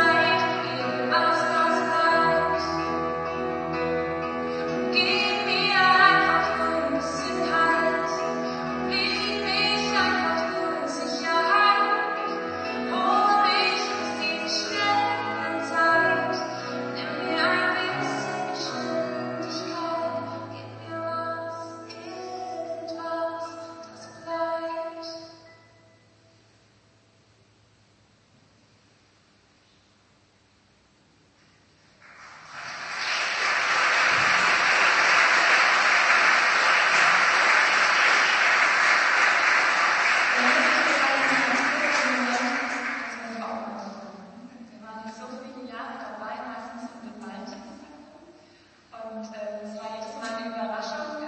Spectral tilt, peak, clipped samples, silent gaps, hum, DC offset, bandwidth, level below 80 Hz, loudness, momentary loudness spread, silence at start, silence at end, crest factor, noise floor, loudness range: -2.5 dB/octave; -4 dBFS; under 0.1%; none; none; under 0.1%; 8.8 kHz; -62 dBFS; -22 LUFS; 19 LU; 0 s; 0 s; 20 dB; -61 dBFS; 20 LU